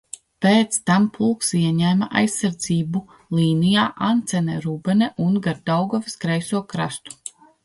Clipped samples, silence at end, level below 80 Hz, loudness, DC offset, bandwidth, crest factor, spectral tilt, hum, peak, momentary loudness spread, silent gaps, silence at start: under 0.1%; 0.35 s; -58 dBFS; -21 LUFS; under 0.1%; 11.5 kHz; 16 dB; -5 dB/octave; none; -4 dBFS; 9 LU; none; 0.4 s